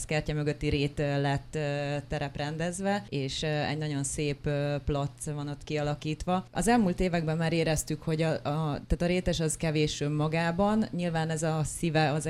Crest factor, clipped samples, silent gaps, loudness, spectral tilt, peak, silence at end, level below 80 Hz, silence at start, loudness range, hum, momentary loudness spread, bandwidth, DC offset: 18 dB; under 0.1%; none; -30 LUFS; -5.5 dB/octave; -12 dBFS; 0 s; -44 dBFS; 0 s; 3 LU; none; 6 LU; 14 kHz; under 0.1%